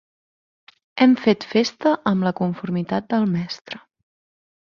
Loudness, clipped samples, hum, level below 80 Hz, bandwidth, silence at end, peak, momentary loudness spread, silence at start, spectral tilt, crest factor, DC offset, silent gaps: -21 LUFS; under 0.1%; none; -62 dBFS; 7 kHz; 0.9 s; -2 dBFS; 16 LU; 0.95 s; -6.5 dB/octave; 20 dB; under 0.1%; 3.61-3.65 s